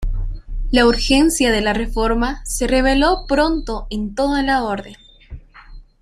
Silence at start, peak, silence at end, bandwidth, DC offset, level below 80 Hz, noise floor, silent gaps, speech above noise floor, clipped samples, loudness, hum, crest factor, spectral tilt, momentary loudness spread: 0 s; -2 dBFS; 0.2 s; 15 kHz; under 0.1%; -26 dBFS; -40 dBFS; none; 23 dB; under 0.1%; -17 LUFS; none; 16 dB; -4 dB/octave; 12 LU